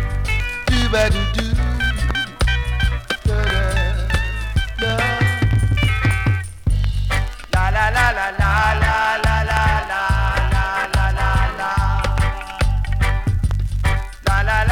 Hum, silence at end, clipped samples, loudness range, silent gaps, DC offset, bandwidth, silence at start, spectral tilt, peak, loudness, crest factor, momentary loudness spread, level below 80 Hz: none; 0 s; under 0.1%; 3 LU; none; under 0.1%; 15 kHz; 0 s; -5 dB/octave; 0 dBFS; -19 LUFS; 18 dB; 5 LU; -22 dBFS